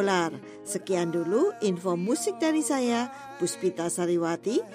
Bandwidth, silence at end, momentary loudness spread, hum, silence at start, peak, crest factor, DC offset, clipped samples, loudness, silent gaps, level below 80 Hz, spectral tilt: 15.5 kHz; 0 s; 7 LU; none; 0 s; -14 dBFS; 14 dB; under 0.1%; under 0.1%; -28 LUFS; none; -76 dBFS; -4.5 dB/octave